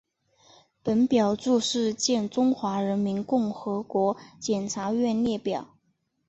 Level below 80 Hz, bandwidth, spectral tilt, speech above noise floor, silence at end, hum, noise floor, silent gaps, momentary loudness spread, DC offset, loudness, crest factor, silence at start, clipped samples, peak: -64 dBFS; 8.2 kHz; -5 dB/octave; 48 dB; 0.65 s; none; -73 dBFS; none; 7 LU; under 0.1%; -26 LUFS; 16 dB; 0.85 s; under 0.1%; -10 dBFS